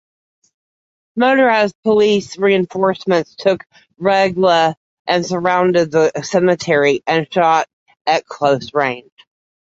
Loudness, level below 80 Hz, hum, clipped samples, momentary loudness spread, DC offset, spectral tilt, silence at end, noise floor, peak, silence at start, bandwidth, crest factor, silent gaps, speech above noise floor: -15 LUFS; -60 dBFS; none; under 0.1%; 6 LU; under 0.1%; -5 dB/octave; 0.7 s; under -90 dBFS; -2 dBFS; 1.15 s; 8 kHz; 14 dB; 1.75-1.83 s, 4.77-5.05 s, 7.73-7.86 s, 8.01-8.05 s; over 75 dB